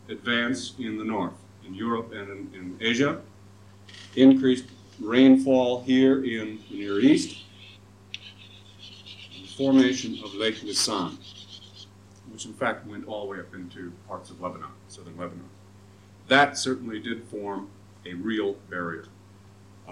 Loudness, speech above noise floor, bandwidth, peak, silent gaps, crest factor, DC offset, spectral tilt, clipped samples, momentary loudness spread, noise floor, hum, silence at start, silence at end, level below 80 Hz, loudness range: -24 LUFS; 26 dB; 11.5 kHz; -4 dBFS; none; 22 dB; under 0.1%; -4.5 dB/octave; under 0.1%; 24 LU; -51 dBFS; none; 0.1 s; 0 s; -68 dBFS; 14 LU